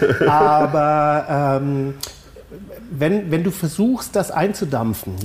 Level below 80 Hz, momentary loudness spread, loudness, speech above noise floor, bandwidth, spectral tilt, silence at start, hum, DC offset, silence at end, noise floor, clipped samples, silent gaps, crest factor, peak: -48 dBFS; 17 LU; -18 LUFS; 21 dB; 15.5 kHz; -6.5 dB/octave; 0 s; none; under 0.1%; 0 s; -39 dBFS; under 0.1%; none; 12 dB; -6 dBFS